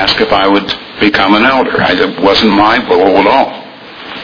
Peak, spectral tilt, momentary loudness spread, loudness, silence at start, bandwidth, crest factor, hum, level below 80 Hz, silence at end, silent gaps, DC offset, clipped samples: 0 dBFS; -5.5 dB/octave; 12 LU; -9 LUFS; 0 s; 5.4 kHz; 10 dB; none; -38 dBFS; 0 s; none; under 0.1%; 0.9%